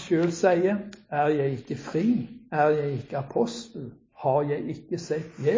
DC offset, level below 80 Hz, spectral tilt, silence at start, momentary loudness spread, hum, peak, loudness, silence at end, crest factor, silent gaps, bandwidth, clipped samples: under 0.1%; -62 dBFS; -7 dB/octave; 0 s; 11 LU; none; -8 dBFS; -27 LUFS; 0 s; 18 dB; none; 7.6 kHz; under 0.1%